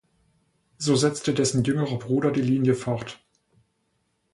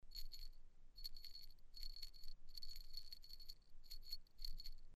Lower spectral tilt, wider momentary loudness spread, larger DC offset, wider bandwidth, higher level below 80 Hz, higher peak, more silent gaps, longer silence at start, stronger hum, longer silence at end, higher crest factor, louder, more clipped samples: first, -5.5 dB/octave vs -1.5 dB/octave; about the same, 8 LU vs 8 LU; neither; second, 11.5 kHz vs 14 kHz; about the same, -58 dBFS vs -54 dBFS; first, -8 dBFS vs -34 dBFS; neither; first, 0.8 s vs 0.05 s; neither; first, 1.2 s vs 0 s; about the same, 18 dB vs 14 dB; first, -24 LUFS vs -57 LUFS; neither